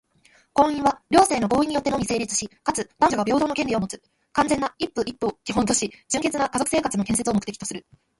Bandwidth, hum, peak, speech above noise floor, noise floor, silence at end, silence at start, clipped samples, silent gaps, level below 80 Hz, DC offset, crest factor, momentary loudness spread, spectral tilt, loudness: 12 kHz; none; -4 dBFS; 36 dB; -59 dBFS; 0.4 s; 0.55 s; under 0.1%; none; -50 dBFS; under 0.1%; 20 dB; 8 LU; -4 dB/octave; -23 LUFS